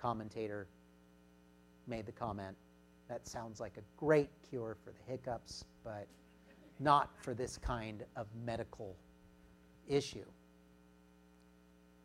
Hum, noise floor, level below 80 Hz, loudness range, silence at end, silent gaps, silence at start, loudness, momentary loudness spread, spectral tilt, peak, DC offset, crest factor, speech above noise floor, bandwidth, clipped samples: none; -65 dBFS; -60 dBFS; 8 LU; 1.7 s; none; 0 s; -41 LUFS; 20 LU; -5.5 dB/octave; -16 dBFS; under 0.1%; 26 dB; 25 dB; 15.5 kHz; under 0.1%